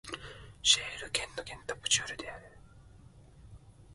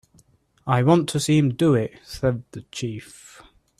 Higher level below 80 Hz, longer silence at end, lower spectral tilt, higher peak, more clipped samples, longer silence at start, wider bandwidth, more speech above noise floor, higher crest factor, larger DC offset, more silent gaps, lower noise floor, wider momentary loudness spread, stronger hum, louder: second, -58 dBFS vs -52 dBFS; second, 0 s vs 0.75 s; second, 0 dB/octave vs -6.5 dB/octave; second, -10 dBFS vs -4 dBFS; neither; second, 0.05 s vs 0.65 s; second, 12 kHz vs 14 kHz; second, 22 dB vs 37 dB; first, 26 dB vs 20 dB; neither; neither; about the same, -56 dBFS vs -59 dBFS; about the same, 19 LU vs 18 LU; neither; second, -30 LUFS vs -22 LUFS